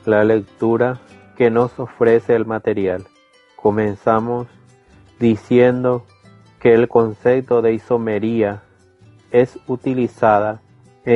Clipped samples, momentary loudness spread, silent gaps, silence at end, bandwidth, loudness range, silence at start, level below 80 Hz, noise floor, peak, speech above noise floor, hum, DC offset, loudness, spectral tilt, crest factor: under 0.1%; 10 LU; none; 0 s; 7.2 kHz; 3 LU; 0.05 s; -54 dBFS; -49 dBFS; -2 dBFS; 33 dB; none; under 0.1%; -17 LUFS; -8.5 dB/octave; 16 dB